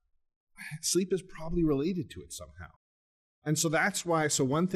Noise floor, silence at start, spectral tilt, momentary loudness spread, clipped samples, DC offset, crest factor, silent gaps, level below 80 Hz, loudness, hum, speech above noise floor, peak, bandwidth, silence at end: under -90 dBFS; 0.6 s; -4 dB/octave; 17 LU; under 0.1%; under 0.1%; 16 dB; 2.76-3.42 s; -50 dBFS; -30 LUFS; none; over 60 dB; -14 dBFS; 14 kHz; 0 s